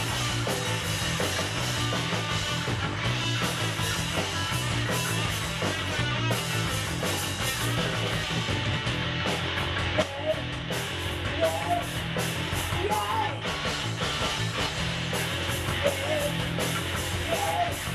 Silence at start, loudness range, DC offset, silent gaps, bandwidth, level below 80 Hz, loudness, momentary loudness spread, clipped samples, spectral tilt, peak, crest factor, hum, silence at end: 0 s; 1 LU; under 0.1%; none; 14 kHz; -44 dBFS; -28 LUFS; 2 LU; under 0.1%; -3.5 dB/octave; -12 dBFS; 16 dB; none; 0 s